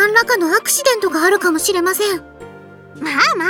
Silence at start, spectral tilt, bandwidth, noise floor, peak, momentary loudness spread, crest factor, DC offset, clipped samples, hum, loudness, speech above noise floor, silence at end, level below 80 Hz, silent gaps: 0 s; -1.5 dB/octave; over 20 kHz; -38 dBFS; 0 dBFS; 7 LU; 16 dB; under 0.1%; under 0.1%; none; -15 LUFS; 23 dB; 0 s; -54 dBFS; none